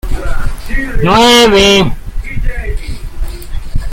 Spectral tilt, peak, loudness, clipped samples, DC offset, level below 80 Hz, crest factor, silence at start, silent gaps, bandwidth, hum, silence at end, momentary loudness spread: -4 dB/octave; 0 dBFS; -10 LUFS; under 0.1%; under 0.1%; -18 dBFS; 10 dB; 0.05 s; none; 16.5 kHz; none; 0 s; 21 LU